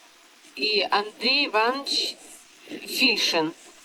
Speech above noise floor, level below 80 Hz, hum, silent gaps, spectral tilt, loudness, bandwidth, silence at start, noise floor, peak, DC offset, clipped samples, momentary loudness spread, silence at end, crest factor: 28 dB; -78 dBFS; none; none; -1.5 dB/octave; -23 LUFS; over 20 kHz; 0.55 s; -53 dBFS; -8 dBFS; under 0.1%; under 0.1%; 19 LU; 0.15 s; 18 dB